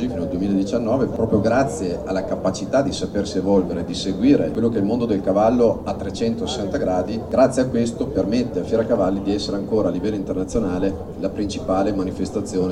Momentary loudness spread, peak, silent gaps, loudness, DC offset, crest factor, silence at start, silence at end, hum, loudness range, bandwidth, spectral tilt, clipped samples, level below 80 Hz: 7 LU; -2 dBFS; none; -21 LUFS; under 0.1%; 18 dB; 0 s; 0 s; none; 3 LU; 11.5 kHz; -6.5 dB/octave; under 0.1%; -40 dBFS